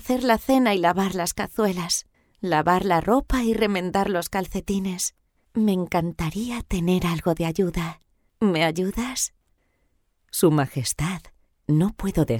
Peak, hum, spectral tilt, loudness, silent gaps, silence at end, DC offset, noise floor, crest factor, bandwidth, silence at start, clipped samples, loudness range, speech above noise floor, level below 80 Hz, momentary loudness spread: -6 dBFS; none; -5 dB/octave; -23 LUFS; none; 0 s; under 0.1%; -68 dBFS; 18 dB; 19 kHz; 0 s; under 0.1%; 3 LU; 45 dB; -42 dBFS; 8 LU